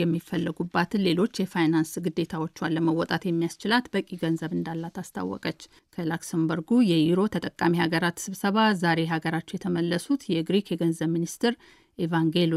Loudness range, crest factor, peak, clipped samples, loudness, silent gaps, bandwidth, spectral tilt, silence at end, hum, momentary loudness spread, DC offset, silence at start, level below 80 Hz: 4 LU; 16 dB; -10 dBFS; under 0.1%; -26 LUFS; none; 14.5 kHz; -6 dB/octave; 0 s; none; 9 LU; under 0.1%; 0 s; -64 dBFS